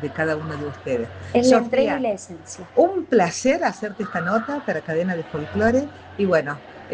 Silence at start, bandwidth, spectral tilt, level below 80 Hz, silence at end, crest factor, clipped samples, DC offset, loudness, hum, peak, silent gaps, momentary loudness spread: 0 s; 9.8 kHz; -5.5 dB/octave; -56 dBFS; 0 s; 18 dB; under 0.1%; under 0.1%; -22 LUFS; none; -4 dBFS; none; 12 LU